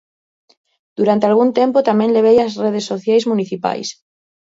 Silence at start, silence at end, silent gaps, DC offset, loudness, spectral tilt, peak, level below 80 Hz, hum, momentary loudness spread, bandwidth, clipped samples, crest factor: 1 s; 0.55 s; none; under 0.1%; -15 LUFS; -6 dB/octave; 0 dBFS; -62 dBFS; none; 9 LU; 7.8 kHz; under 0.1%; 16 dB